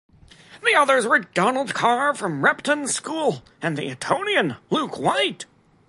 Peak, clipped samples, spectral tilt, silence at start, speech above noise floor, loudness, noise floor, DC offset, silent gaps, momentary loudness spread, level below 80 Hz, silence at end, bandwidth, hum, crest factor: -2 dBFS; under 0.1%; -3.5 dB/octave; 0.5 s; 26 dB; -21 LUFS; -48 dBFS; under 0.1%; none; 9 LU; -64 dBFS; 0.45 s; 11.5 kHz; none; 20 dB